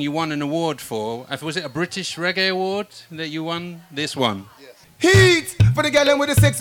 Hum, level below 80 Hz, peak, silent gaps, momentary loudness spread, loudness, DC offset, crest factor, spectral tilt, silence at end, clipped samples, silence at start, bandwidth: none; -42 dBFS; -6 dBFS; none; 13 LU; -20 LUFS; under 0.1%; 14 dB; -5 dB/octave; 0 s; under 0.1%; 0 s; 18 kHz